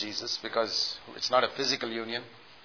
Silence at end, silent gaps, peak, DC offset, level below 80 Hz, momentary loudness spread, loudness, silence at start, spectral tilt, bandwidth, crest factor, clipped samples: 0.05 s; none; -10 dBFS; under 0.1%; -74 dBFS; 8 LU; -29 LUFS; 0 s; 0 dB/octave; 5.4 kHz; 20 dB; under 0.1%